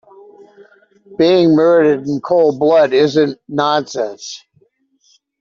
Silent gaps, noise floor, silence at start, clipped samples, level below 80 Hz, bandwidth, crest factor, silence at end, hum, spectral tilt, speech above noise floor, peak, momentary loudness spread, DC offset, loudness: none; -58 dBFS; 1.1 s; under 0.1%; -60 dBFS; 7.4 kHz; 12 dB; 1.05 s; none; -6 dB/octave; 45 dB; -2 dBFS; 16 LU; under 0.1%; -13 LUFS